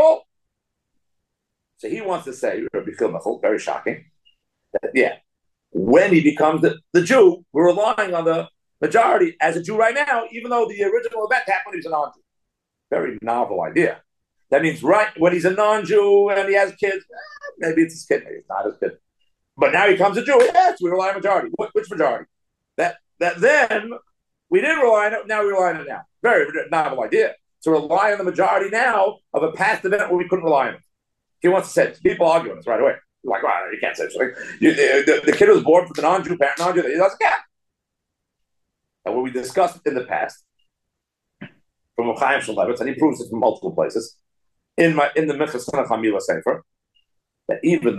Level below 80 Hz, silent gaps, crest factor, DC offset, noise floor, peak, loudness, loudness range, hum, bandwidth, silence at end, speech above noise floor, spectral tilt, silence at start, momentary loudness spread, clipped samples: -66 dBFS; none; 18 dB; under 0.1%; -80 dBFS; -2 dBFS; -19 LUFS; 7 LU; none; 12.5 kHz; 0 s; 61 dB; -5 dB/octave; 0 s; 11 LU; under 0.1%